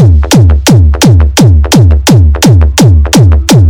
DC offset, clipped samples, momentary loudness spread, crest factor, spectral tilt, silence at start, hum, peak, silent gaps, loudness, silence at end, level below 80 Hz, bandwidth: under 0.1%; 20%; 1 LU; 4 dB; -5.5 dB/octave; 0 s; none; 0 dBFS; none; -5 LUFS; 0 s; -10 dBFS; 18 kHz